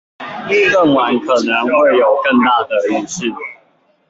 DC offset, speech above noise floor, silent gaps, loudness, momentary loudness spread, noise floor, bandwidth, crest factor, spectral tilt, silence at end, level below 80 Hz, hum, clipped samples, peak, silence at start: under 0.1%; 42 dB; none; -13 LUFS; 14 LU; -55 dBFS; 8 kHz; 12 dB; -4 dB/octave; 0.55 s; -58 dBFS; none; under 0.1%; -2 dBFS; 0.2 s